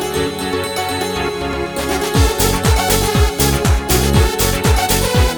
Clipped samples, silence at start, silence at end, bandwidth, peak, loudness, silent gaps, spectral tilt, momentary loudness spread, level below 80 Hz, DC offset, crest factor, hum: under 0.1%; 0 s; 0 s; over 20 kHz; 0 dBFS; -15 LUFS; none; -4 dB/octave; 6 LU; -20 dBFS; under 0.1%; 14 dB; none